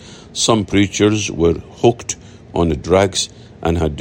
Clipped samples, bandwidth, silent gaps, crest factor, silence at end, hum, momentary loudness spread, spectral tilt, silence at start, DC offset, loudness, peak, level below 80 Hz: under 0.1%; 16.5 kHz; none; 16 dB; 0 s; none; 11 LU; -4.5 dB/octave; 0 s; under 0.1%; -17 LUFS; 0 dBFS; -38 dBFS